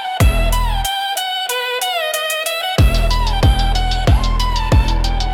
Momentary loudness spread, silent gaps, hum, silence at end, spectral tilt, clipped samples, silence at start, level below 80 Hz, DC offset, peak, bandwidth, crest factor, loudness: 4 LU; none; none; 0 s; -4 dB/octave; under 0.1%; 0 s; -18 dBFS; under 0.1%; -4 dBFS; 18 kHz; 12 dB; -17 LUFS